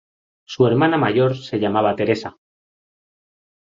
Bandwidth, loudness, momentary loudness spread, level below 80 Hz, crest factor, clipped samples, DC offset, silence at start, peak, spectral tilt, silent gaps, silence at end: 7.6 kHz; -19 LUFS; 8 LU; -56 dBFS; 18 dB; under 0.1%; under 0.1%; 0.5 s; -2 dBFS; -7.5 dB/octave; none; 1.45 s